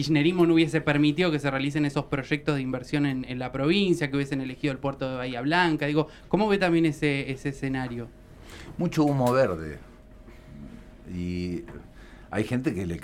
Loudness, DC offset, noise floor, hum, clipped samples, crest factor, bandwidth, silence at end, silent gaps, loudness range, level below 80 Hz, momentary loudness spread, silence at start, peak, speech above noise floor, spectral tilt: -26 LUFS; under 0.1%; -48 dBFS; none; under 0.1%; 18 dB; 15 kHz; 0 s; none; 4 LU; -50 dBFS; 17 LU; 0 s; -8 dBFS; 22 dB; -6.5 dB/octave